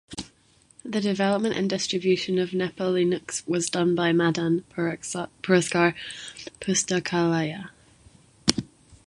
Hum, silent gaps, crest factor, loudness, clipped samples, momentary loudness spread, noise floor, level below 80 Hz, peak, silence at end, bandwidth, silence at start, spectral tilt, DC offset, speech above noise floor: none; none; 26 dB; -25 LUFS; under 0.1%; 14 LU; -60 dBFS; -58 dBFS; 0 dBFS; 0.1 s; 11.5 kHz; 0.1 s; -4.5 dB/octave; under 0.1%; 35 dB